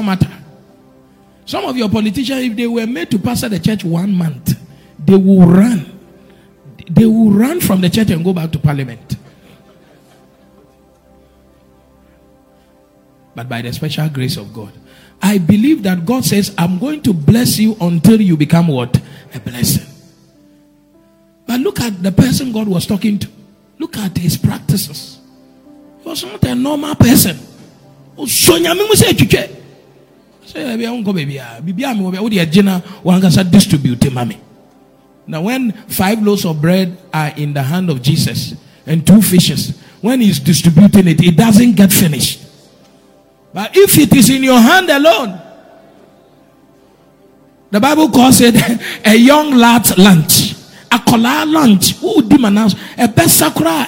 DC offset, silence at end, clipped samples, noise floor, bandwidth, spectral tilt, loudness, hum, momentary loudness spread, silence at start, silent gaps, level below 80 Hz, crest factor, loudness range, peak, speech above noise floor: under 0.1%; 0 s; 1%; -49 dBFS; over 20 kHz; -5 dB/octave; -11 LUFS; none; 16 LU; 0 s; none; -42 dBFS; 12 dB; 10 LU; 0 dBFS; 38 dB